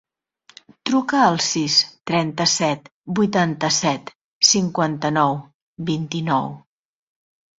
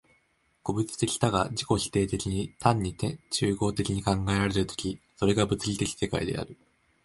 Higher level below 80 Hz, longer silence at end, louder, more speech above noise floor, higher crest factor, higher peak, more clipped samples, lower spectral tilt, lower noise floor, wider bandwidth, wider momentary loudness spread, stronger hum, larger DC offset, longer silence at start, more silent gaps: second, -60 dBFS vs -48 dBFS; first, 1 s vs 0.5 s; first, -19 LUFS vs -28 LUFS; second, 37 dB vs 42 dB; about the same, 20 dB vs 22 dB; first, -2 dBFS vs -6 dBFS; neither; second, -3.5 dB/octave vs -5 dB/octave; second, -56 dBFS vs -69 dBFS; second, 8 kHz vs 11.5 kHz; first, 11 LU vs 7 LU; neither; neither; first, 0.85 s vs 0.65 s; first, 2.92-3.04 s, 4.15-4.41 s, 5.54-5.75 s vs none